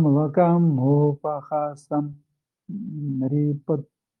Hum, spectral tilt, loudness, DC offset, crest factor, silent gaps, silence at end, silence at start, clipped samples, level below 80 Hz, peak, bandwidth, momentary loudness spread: none; -11.5 dB/octave; -23 LUFS; under 0.1%; 16 dB; none; 0.35 s; 0 s; under 0.1%; -70 dBFS; -6 dBFS; 6.2 kHz; 14 LU